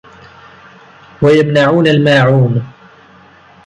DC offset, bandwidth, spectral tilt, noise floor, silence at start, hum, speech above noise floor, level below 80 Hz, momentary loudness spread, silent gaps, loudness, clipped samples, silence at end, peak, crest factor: under 0.1%; 9.6 kHz; -7.5 dB/octave; -42 dBFS; 1.2 s; none; 33 dB; -48 dBFS; 7 LU; none; -10 LUFS; under 0.1%; 0.95 s; 0 dBFS; 12 dB